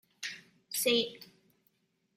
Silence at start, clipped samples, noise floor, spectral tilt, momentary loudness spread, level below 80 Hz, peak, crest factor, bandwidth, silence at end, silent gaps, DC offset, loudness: 0.2 s; under 0.1%; -75 dBFS; -1.5 dB/octave; 21 LU; -86 dBFS; -16 dBFS; 20 dB; 16.5 kHz; 0.95 s; none; under 0.1%; -32 LUFS